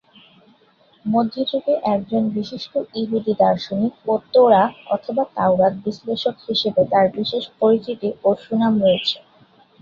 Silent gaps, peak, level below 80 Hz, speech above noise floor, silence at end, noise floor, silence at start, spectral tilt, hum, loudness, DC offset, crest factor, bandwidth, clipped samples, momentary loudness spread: none; -2 dBFS; -60 dBFS; 37 dB; 0.65 s; -56 dBFS; 1.05 s; -7 dB/octave; none; -19 LUFS; under 0.1%; 18 dB; 7 kHz; under 0.1%; 9 LU